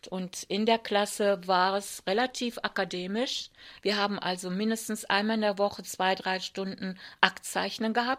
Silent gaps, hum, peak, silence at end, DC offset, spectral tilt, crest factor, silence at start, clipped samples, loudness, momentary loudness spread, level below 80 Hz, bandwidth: none; none; -2 dBFS; 0 s; under 0.1%; -3.5 dB/octave; 26 dB; 0.05 s; under 0.1%; -29 LUFS; 9 LU; -70 dBFS; 16 kHz